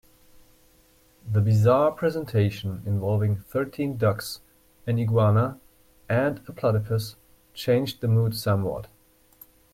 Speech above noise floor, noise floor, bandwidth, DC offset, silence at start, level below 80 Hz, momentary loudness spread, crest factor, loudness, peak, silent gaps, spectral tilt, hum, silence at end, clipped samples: 36 dB; -59 dBFS; 15.5 kHz; under 0.1%; 1.25 s; -56 dBFS; 12 LU; 16 dB; -25 LUFS; -8 dBFS; none; -7.5 dB/octave; none; 0.85 s; under 0.1%